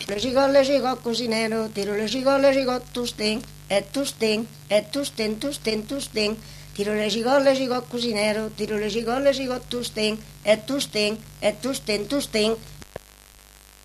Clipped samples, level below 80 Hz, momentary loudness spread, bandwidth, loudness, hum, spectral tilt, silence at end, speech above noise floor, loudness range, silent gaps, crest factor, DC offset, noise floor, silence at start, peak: under 0.1%; -50 dBFS; 9 LU; 14 kHz; -24 LUFS; 50 Hz at -55 dBFS; -3.5 dB/octave; 0.85 s; 26 dB; 3 LU; none; 18 dB; under 0.1%; -50 dBFS; 0 s; -6 dBFS